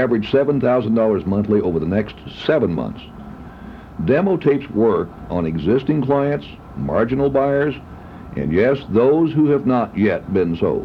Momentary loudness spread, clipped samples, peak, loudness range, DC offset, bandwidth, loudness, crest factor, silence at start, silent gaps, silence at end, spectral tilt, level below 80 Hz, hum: 18 LU; under 0.1%; -4 dBFS; 3 LU; under 0.1%; 6 kHz; -18 LUFS; 14 dB; 0 s; none; 0 s; -9.5 dB/octave; -42 dBFS; none